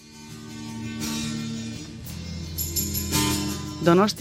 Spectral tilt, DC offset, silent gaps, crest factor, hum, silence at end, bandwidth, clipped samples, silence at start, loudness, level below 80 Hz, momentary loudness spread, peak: -4 dB/octave; under 0.1%; none; 22 dB; none; 0 s; 16.5 kHz; under 0.1%; 0 s; -26 LUFS; -48 dBFS; 16 LU; -4 dBFS